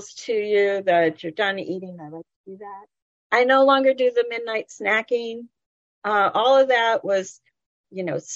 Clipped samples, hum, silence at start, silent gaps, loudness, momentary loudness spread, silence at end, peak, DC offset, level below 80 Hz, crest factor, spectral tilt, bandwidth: under 0.1%; none; 0 s; 2.36-2.44 s, 3.02-3.30 s, 5.66-6.02 s, 7.66-7.84 s; -21 LUFS; 22 LU; 0 s; -6 dBFS; under 0.1%; -76 dBFS; 18 dB; -4 dB/octave; 7.8 kHz